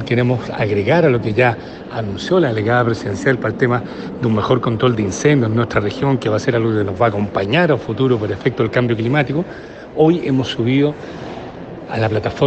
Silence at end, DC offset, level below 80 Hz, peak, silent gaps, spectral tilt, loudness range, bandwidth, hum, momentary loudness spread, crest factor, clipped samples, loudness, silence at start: 0 s; under 0.1%; -46 dBFS; 0 dBFS; none; -6.5 dB/octave; 1 LU; 8.6 kHz; none; 13 LU; 16 dB; under 0.1%; -17 LUFS; 0 s